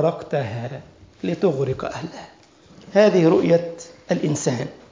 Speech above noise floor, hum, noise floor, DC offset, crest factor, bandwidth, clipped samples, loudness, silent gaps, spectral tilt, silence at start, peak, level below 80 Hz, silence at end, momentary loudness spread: 28 dB; none; -49 dBFS; under 0.1%; 18 dB; 7.6 kHz; under 0.1%; -21 LUFS; none; -6.5 dB/octave; 0 s; -4 dBFS; -56 dBFS; 0.2 s; 18 LU